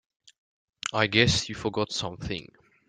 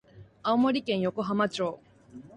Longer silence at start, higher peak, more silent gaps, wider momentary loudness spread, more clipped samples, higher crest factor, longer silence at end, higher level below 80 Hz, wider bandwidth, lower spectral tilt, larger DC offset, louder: first, 0.85 s vs 0.15 s; first, -6 dBFS vs -12 dBFS; neither; first, 14 LU vs 9 LU; neither; first, 24 dB vs 16 dB; first, 0.45 s vs 0.1 s; first, -52 dBFS vs -66 dBFS; about the same, 9.6 kHz vs 9.8 kHz; second, -4 dB/octave vs -6 dB/octave; neither; about the same, -26 LUFS vs -28 LUFS